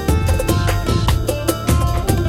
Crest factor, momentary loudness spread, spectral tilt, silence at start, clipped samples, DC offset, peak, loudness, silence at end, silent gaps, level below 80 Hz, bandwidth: 14 dB; 2 LU; -5.5 dB/octave; 0 s; under 0.1%; under 0.1%; -2 dBFS; -18 LUFS; 0 s; none; -22 dBFS; 16.5 kHz